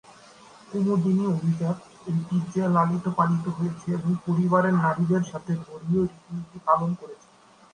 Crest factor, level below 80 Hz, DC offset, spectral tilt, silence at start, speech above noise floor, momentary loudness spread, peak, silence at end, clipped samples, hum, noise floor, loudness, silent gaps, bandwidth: 20 dB; -62 dBFS; under 0.1%; -8.5 dB/octave; 0.7 s; 26 dB; 9 LU; -6 dBFS; 0.6 s; under 0.1%; none; -50 dBFS; -25 LUFS; none; 9.8 kHz